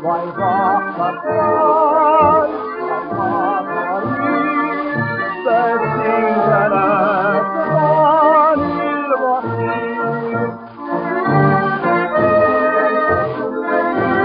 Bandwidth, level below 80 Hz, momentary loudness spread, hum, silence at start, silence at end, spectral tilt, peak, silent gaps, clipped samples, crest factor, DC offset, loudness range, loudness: 5.2 kHz; -52 dBFS; 8 LU; none; 0 s; 0 s; -5.5 dB/octave; -2 dBFS; none; under 0.1%; 14 dB; under 0.1%; 4 LU; -16 LUFS